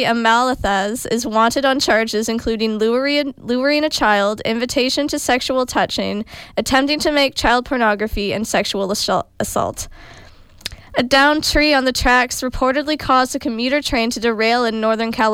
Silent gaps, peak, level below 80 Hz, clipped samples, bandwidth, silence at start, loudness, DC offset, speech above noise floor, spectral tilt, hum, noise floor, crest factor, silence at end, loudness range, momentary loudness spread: none; -4 dBFS; -36 dBFS; under 0.1%; 17 kHz; 0 s; -17 LUFS; under 0.1%; 25 dB; -3 dB/octave; none; -42 dBFS; 14 dB; 0 s; 3 LU; 7 LU